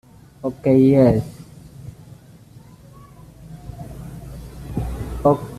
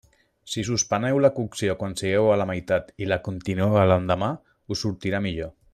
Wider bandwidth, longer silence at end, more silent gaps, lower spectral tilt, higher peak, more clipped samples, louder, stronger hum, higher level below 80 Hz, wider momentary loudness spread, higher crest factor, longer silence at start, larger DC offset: about the same, 14 kHz vs 13.5 kHz; second, 0 s vs 0.2 s; neither; first, -9 dB/octave vs -5 dB/octave; about the same, -4 dBFS vs -6 dBFS; neither; first, -18 LUFS vs -24 LUFS; neither; first, -38 dBFS vs -52 dBFS; first, 26 LU vs 10 LU; about the same, 18 dB vs 18 dB; about the same, 0.45 s vs 0.45 s; neither